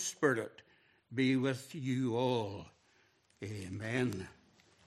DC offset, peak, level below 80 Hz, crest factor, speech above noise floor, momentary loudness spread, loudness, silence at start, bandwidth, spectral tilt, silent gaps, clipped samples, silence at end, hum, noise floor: under 0.1%; -16 dBFS; -74 dBFS; 20 dB; 36 dB; 15 LU; -36 LUFS; 0 s; 14 kHz; -5 dB/octave; none; under 0.1%; 0.55 s; none; -70 dBFS